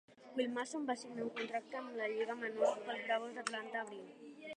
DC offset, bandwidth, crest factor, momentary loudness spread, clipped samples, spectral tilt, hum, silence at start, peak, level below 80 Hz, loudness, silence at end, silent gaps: under 0.1%; 10.5 kHz; 20 dB; 9 LU; under 0.1%; -3 dB/octave; none; 0.1 s; -22 dBFS; under -90 dBFS; -40 LUFS; 0 s; none